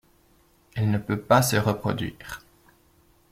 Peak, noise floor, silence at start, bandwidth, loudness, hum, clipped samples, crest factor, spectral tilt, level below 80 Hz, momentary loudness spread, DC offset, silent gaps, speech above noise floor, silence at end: -6 dBFS; -61 dBFS; 0.75 s; 16 kHz; -24 LUFS; none; under 0.1%; 22 dB; -5.5 dB/octave; -54 dBFS; 20 LU; under 0.1%; none; 37 dB; 0.95 s